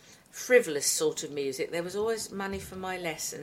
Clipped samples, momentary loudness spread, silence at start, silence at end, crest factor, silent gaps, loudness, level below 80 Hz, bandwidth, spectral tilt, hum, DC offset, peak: under 0.1%; 12 LU; 0.05 s; 0 s; 22 dB; none; -29 LUFS; -62 dBFS; 16.5 kHz; -2.5 dB/octave; none; under 0.1%; -8 dBFS